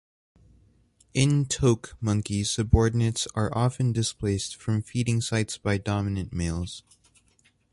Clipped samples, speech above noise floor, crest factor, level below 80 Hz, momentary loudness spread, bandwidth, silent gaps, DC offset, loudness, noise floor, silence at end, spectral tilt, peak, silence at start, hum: under 0.1%; 39 dB; 22 dB; -40 dBFS; 7 LU; 11.5 kHz; none; under 0.1%; -26 LUFS; -65 dBFS; 0.95 s; -5.5 dB/octave; -6 dBFS; 1.15 s; none